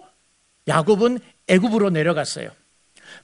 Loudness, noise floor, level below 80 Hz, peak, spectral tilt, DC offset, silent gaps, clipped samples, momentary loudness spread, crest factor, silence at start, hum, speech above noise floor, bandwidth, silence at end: -20 LUFS; -63 dBFS; -60 dBFS; -2 dBFS; -5.5 dB/octave; under 0.1%; none; under 0.1%; 14 LU; 20 dB; 0.65 s; none; 44 dB; 11 kHz; 0.05 s